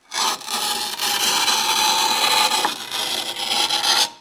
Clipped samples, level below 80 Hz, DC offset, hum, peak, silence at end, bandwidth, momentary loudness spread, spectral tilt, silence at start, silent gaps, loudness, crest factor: under 0.1%; -64 dBFS; under 0.1%; none; -4 dBFS; 0.05 s; 19.5 kHz; 6 LU; 1 dB/octave; 0.1 s; none; -18 LUFS; 18 dB